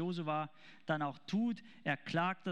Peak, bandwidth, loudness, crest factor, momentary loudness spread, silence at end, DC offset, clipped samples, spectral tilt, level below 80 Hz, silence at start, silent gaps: -20 dBFS; 9.6 kHz; -38 LUFS; 18 dB; 6 LU; 0 s; 0.1%; under 0.1%; -7 dB/octave; -84 dBFS; 0 s; none